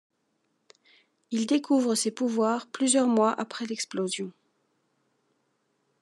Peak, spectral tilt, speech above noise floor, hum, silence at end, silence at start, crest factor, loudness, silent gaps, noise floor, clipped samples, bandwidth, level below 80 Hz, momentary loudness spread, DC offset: -10 dBFS; -3.5 dB/octave; 49 dB; none; 1.7 s; 1.3 s; 18 dB; -26 LUFS; none; -75 dBFS; under 0.1%; 12.5 kHz; under -90 dBFS; 10 LU; under 0.1%